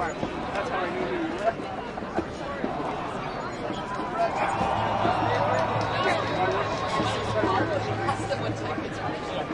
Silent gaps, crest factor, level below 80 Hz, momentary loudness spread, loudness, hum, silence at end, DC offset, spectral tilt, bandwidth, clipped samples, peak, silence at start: none; 16 dB; -48 dBFS; 7 LU; -28 LUFS; none; 0 s; under 0.1%; -5.5 dB/octave; 11 kHz; under 0.1%; -10 dBFS; 0 s